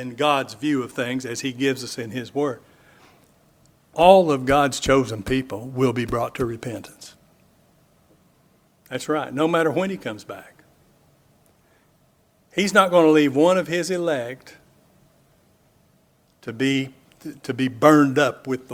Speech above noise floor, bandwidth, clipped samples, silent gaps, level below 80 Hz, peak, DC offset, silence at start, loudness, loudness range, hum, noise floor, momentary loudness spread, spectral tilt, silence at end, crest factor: 40 dB; 16.5 kHz; under 0.1%; none; -50 dBFS; 0 dBFS; under 0.1%; 0 s; -21 LUFS; 10 LU; none; -61 dBFS; 19 LU; -5 dB/octave; 0 s; 22 dB